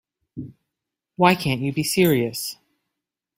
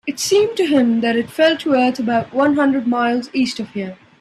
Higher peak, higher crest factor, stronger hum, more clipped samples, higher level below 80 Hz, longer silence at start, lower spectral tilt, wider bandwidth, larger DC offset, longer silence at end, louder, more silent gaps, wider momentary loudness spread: about the same, -2 dBFS vs -2 dBFS; first, 22 dB vs 14 dB; neither; neither; about the same, -56 dBFS vs -60 dBFS; first, 0.35 s vs 0.05 s; about the same, -5 dB/octave vs -4 dB/octave; first, 16 kHz vs 14 kHz; neither; first, 0.85 s vs 0.25 s; second, -21 LUFS vs -17 LUFS; neither; first, 20 LU vs 7 LU